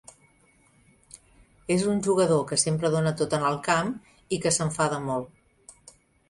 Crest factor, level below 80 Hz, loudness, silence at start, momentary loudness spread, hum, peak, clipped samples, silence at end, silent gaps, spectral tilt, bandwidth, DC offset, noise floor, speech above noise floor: 20 dB; -60 dBFS; -25 LUFS; 1.15 s; 10 LU; none; -8 dBFS; under 0.1%; 0.6 s; none; -4.5 dB/octave; 11.5 kHz; under 0.1%; -62 dBFS; 37 dB